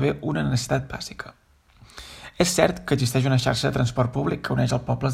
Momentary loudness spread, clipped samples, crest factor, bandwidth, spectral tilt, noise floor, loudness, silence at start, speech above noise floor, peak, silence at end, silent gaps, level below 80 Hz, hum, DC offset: 18 LU; under 0.1%; 22 dB; 15.5 kHz; -5.5 dB/octave; -53 dBFS; -23 LUFS; 0 s; 30 dB; -2 dBFS; 0 s; none; -46 dBFS; none; under 0.1%